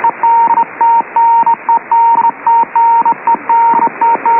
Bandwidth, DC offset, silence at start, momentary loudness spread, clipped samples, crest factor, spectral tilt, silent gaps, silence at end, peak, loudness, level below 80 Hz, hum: 3 kHz; under 0.1%; 0 s; 3 LU; under 0.1%; 8 dB; -8 dB/octave; none; 0 s; -2 dBFS; -10 LUFS; -70 dBFS; none